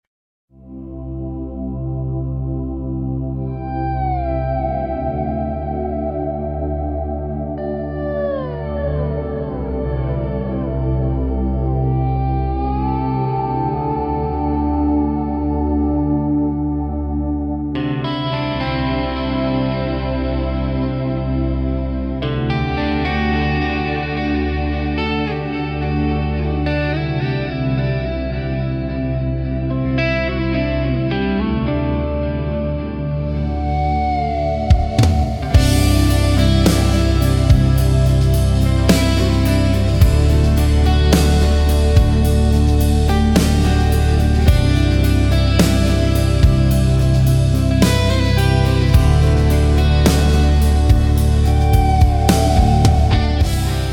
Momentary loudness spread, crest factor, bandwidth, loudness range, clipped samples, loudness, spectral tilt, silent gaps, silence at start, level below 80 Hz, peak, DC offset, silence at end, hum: 9 LU; 16 dB; 17.5 kHz; 8 LU; under 0.1%; -17 LUFS; -6.5 dB/octave; none; 0.65 s; -20 dBFS; 0 dBFS; under 0.1%; 0 s; none